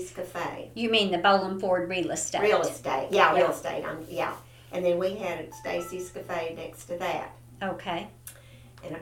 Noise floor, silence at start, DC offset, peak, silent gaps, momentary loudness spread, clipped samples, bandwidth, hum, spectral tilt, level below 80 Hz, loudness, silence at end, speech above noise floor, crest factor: -50 dBFS; 0 s; under 0.1%; -6 dBFS; none; 15 LU; under 0.1%; 17 kHz; none; -3.5 dB/octave; -58 dBFS; -28 LUFS; 0 s; 23 dB; 22 dB